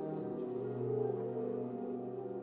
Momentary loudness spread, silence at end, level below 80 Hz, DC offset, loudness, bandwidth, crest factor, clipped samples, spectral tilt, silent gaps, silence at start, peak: 5 LU; 0 s; -80 dBFS; under 0.1%; -39 LUFS; 4 kHz; 14 dB; under 0.1%; -10.5 dB/octave; none; 0 s; -24 dBFS